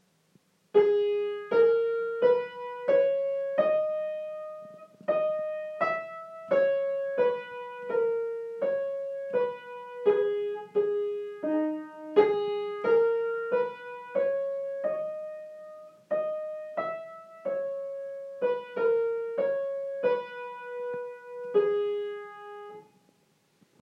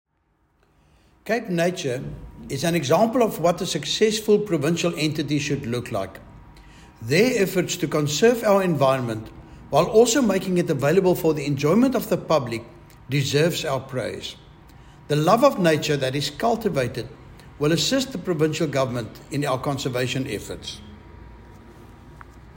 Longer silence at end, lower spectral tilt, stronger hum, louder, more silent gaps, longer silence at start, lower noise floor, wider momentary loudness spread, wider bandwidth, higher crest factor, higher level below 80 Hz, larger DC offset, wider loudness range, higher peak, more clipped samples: first, 1 s vs 0.05 s; first, -6.5 dB/octave vs -5 dB/octave; neither; second, -29 LUFS vs -22 LUFS; neither; second, 0.75 s vs 1.25 s; about the same, -68 dBFS vs -67 dBFS; first, 16 LU vs 13 LU; second, 5.8 kHz vs 16.5 kHz; about the same, 20 dB vs 18 dB; second, under -90 dBFS vs -50 dBFS; neither; about the same, 7 LU vs 5 LU; second, -10 dBFS vs -4 dBFS; neither